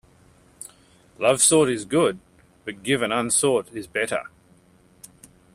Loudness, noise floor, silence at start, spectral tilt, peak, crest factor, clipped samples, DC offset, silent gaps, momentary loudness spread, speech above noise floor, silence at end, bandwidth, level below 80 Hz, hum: -21 LUFS; -56 dBFS; 1.2 s; -3 dB/octave; -4 dBFS; 20 dB; under 0.1%; under 0.1%; none; 25 LU; 35 dB; 1.3 s; 15 kHz; -60 dBFS; none